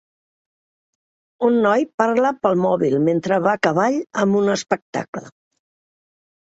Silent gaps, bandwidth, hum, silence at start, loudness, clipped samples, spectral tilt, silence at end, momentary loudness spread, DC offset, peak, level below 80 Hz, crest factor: 1.94-1.98 s, 4.82-4.93 s, 5.08-5.13 s; 8 kHz; none; 1.4 s; -19 LUFS; under 0.1%; -6 dB/octave; 1.3 s; 6 LU; under 0.1%; -2 dBFS; -64 dBFS; 18 dB